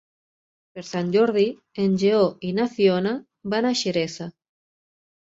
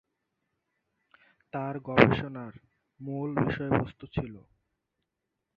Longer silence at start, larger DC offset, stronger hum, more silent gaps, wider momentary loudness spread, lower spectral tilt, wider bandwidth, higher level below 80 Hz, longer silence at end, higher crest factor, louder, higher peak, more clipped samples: second, 0.75 s vs 1.55 s; neither; neither; neither; second, 13 LU vs 20 LU; second, -5.5 dB/octave vs -9 dB/octave; first, 8 kHz vs 6.8 kHz; second, -66 dBFS vs -54 dBFS; about the same, 1.1 s vs 1.15 s; second, 18 dB vs 28 dB; first, -22 LUFS vs -29 LUFS; second, -6 dBFS vs -2 dBFS; neither